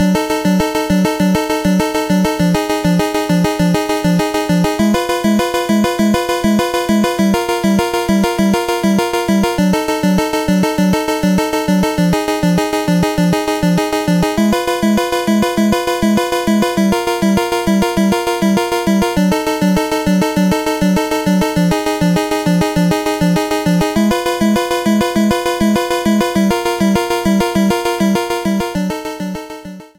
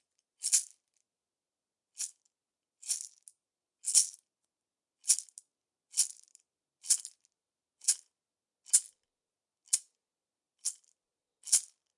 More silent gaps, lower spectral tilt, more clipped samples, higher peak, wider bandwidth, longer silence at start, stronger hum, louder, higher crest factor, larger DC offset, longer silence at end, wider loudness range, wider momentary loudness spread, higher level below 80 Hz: neither; first, -5.5 dB/octave vs 7 dB/octave; neither; first, 0 dBFS vs -6 dBFS; first, 17 kHz vs 11.5 kHz; second, 0 s vs 0.4 s; neither; first, -14 LUFS vs -30 LUFS; second, 14 dB vs 30 dB; neither; second, 0.1 s vs 0.3 s; second, 0 LU vs 4 LU; second, 1 LU vs 20 LU; first, -36 dBFS vs under -90 dBFS